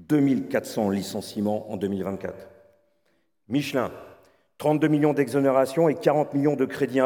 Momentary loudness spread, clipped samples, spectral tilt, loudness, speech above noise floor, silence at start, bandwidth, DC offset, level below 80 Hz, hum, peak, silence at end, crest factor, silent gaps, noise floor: 11 LU; under 0.1%; -6.5 dB/octave; -24 LUFS; 47 dB; 0 s; 19 kHz; under 0.1%; -70 dBFS; none; -6 dBFS; 0 s; 18 dB; none; -71 dBFS